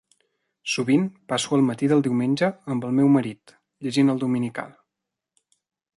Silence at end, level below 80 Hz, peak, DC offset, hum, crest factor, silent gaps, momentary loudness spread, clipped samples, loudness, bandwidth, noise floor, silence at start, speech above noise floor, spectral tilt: 1.3 s; -68 dBFS; -8 dBFS; under 0.1%; none; 16 dB; none; 14 LU; under 0.1%; -22 LUFS; 11.5 kHz; -85 dBFS; 0.65 s; 63 dB; -6 dB/octave